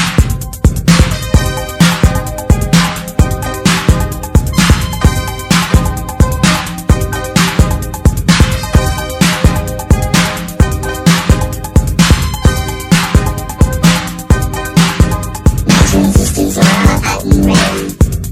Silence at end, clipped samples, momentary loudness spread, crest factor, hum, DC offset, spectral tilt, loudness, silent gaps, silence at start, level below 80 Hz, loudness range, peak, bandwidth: 0 s; 0.8%; 5 LU; 10 dB; none; under 0.1%; -5 dB/octave; -12 LUFS; none; 0 s; -16 dBFS; 2 LU; 0 dBFS; 16.5 kHz